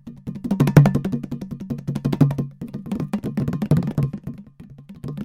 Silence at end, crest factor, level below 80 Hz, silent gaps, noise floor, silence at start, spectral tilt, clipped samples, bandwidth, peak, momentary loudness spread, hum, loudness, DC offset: 0 s; 22 dB; -46 dBFS; none; -43 dBFS; 0.05 s; -8.5 dB/octave; under 0.1%; 14.5 kHz; 0 dBFS; 19 LU; none; -22 LUFS; under 0.1%